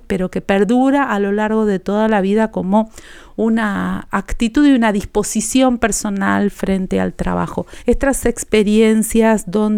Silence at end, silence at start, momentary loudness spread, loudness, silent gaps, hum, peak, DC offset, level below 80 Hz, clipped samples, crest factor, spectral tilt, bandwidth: 0 s; 0.1 s; 8 LU; -16 LUFS; none; none; -2 dBFS; under 0.1%; -32 dBFS; under 0.1%; 12 dB; -5 dB/octave; 16 kHz